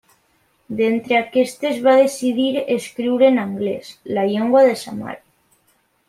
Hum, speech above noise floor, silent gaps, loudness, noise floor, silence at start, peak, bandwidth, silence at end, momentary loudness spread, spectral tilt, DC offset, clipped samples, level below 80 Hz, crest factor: none; 45 dB; none; -18 LUFS; -62 dBFS; 0.7 s; -2 dBFS; 14.5 kHz; 0.95 s; 15 LU; -5 dB/octave; under 0.1%; under 0.1%; -66 dBFS; 16 dB